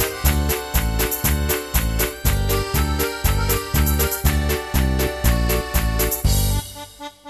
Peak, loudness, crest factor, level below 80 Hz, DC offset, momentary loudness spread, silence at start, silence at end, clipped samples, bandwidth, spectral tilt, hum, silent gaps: -4 dBFS; -20 LUFS; 16 dB; -22 dBFS; under 0.1%; 3 LU; 0 s; 0 s; under 0.1%; 14 kHz; -4.5 dB/octave; none; none